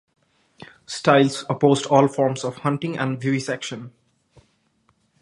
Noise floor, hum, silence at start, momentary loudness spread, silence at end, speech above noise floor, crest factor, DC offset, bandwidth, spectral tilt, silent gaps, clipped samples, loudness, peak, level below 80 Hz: -65 dBFS; none; 0.6 s; 12 LU; 1.3 s; 45 dB; 22 dB; under 0.1%; 11.5 kHz; -5.5 dB/octave; none; under 0.1%; -21 LUFS; 0 dBFS; -66 dBFS